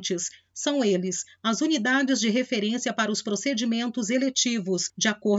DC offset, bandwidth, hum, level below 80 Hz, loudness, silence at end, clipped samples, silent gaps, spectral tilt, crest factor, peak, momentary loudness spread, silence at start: under 0.1%; 8 kHz; none; -80 dBFS; -25 LUFS; 0 s; under 0.1%; none; -3 dB/octave; 16 dB; -10 dBFS; 6 LU; 0 s